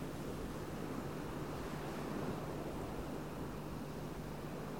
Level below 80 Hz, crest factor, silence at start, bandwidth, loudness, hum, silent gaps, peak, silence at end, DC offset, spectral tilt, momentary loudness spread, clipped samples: -56 dBFS; 16 dB; 0 s; 19.5 kHz; -44 LUFS; none; none; -28 dBFS; 0 s; 0.2%; -6 dB/octave; 3 LU; under 0.1%